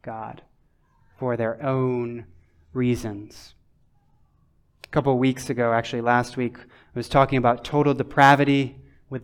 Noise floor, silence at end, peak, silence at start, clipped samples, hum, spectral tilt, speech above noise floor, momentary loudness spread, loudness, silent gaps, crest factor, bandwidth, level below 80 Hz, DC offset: -62 dBFS; 0 s; -2 dBFS; 0.05 s; under 0.1%; none; -6.5 dB/octave; 40 dB; 18 LU; -22 LUFS; none; 22 dB; 15 kHz; -52 dBFS; under 0.1%